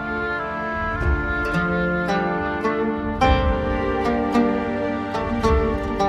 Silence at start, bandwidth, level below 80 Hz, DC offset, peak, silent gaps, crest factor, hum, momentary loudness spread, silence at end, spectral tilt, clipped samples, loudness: 0 s; 12 kHz; -30 dBFS; under 0.1%; -4 dBFS; none; 18 dB; none; 5 LU; 0 s; -7 dB/octave; under 0.1%; -22 LUFS